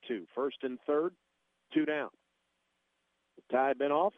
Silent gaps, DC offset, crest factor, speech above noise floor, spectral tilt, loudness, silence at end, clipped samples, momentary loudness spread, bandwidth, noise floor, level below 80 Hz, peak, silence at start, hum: none; under 0.1%; 20 dB; 48 dB; -7.5 dB/octave; -33 LUFS; 0.05 s; under 0.1%; 9 LU; 3.9 kHz; -80 dBFS; -86 dBFS; -16 dBFS; 0.05 s; none